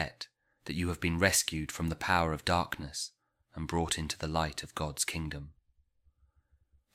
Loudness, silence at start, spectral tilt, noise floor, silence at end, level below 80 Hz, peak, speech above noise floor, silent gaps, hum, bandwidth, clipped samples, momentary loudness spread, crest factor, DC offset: -32 LUFS; 0 s; -3.5 dB/octave; -70 dBFS; 1.45 s; -50 dBFS; -12 dBFS; 37 dB; none; none; 16 kHz; under 0.1%; 16 LU; 24 dB; under 0.1%